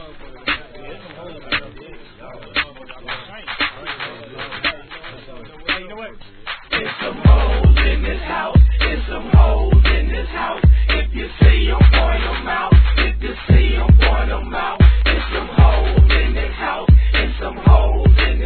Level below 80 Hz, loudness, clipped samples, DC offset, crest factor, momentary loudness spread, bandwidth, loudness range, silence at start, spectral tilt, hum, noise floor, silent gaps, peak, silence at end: -16 dBFS; -16 LUFS; under 0.1%; 0.2%; 14 dB; 16 LU; 4.5 kHz; 10 LU; 0 s; -9.5 dB/octave; none; -37 dBFS; none; 0 dBFS; 0 s